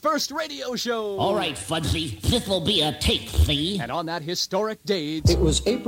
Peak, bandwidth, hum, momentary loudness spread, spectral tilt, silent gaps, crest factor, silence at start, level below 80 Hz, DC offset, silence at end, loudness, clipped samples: -6 dBFS; 16.5 kHz; none; 7 LU; -4.5 dB/octave; none; 18 dB; 0.05 s; -32 dBFS; under 0.1%; 0 s; -24 LUFS; under 0.1%